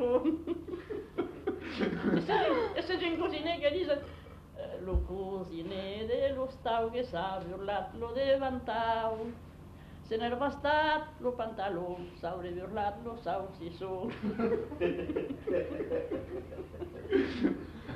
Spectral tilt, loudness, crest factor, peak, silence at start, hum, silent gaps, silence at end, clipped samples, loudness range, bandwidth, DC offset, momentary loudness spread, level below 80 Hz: -7 dB/octave; -34 LUFS; 18 dB; -16 dBFS; 0 s; 50 Hz at -60 dBFS; none; 0 s; under 0.1%; 3 LU; 13.5 kHz; under 0.1%; 12 LU; -50 dBFS